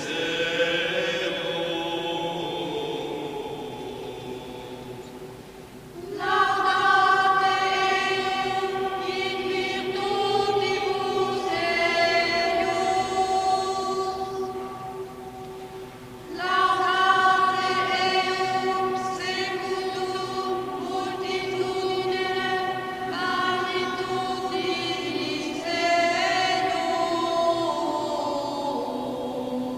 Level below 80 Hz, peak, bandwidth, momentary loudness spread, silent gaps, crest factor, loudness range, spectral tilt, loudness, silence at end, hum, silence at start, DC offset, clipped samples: -58 dBFS; -8 dBFS; 15.5 kHz; 15 LU; none; 18 dB; 7 LU; -3.5 dB/octave; -25 LUFS; 0 s; none; 0 s; under 0.1%; under 0.1%